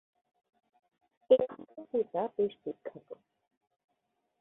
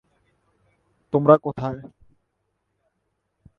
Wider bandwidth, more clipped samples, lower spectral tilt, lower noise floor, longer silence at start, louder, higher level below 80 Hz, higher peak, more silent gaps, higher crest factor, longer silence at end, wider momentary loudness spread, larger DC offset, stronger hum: second, 3.8 kHz vs 5.8 kHz; neither; second, -9 dB/octave vs -10.5 dB/octave; first, -81 dBFS vs -75 dBFS; first, 1.3 s vs 1.15 s; second, -32 LUFS vs -20 LUFS; second, -76 dBFS vs -60 dBFS; second, -12 dBFS vs 0 dBFS; neither; about the same, 24 dB vs 26 dB; second, 1.25 s vs 1.75 s; first, 24 LU vs 15 LU; neither; neither